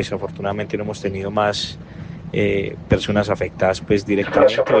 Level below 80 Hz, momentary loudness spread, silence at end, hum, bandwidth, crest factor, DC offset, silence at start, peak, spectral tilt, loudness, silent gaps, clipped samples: -42 dBFS; 11 LU; 0 s; none; 9.4 kHz; 18 dB; under 0.1%; 0 s; -2 dBFS; -6 dB/octave; -20 LUFS; none; under 0.1%